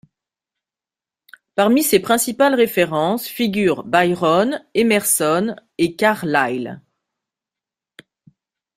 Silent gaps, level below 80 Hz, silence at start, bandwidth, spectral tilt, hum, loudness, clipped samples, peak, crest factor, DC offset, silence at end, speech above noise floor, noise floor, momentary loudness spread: none; -60 dBFS; 1.55 s; 16 kHz; -4 dB/octave; none; -17 LUFS; under 0.1%; -2 dBFS; 18 dB; under 0.1%; 2 s; 72 dB; -90 dBFS; 7 LU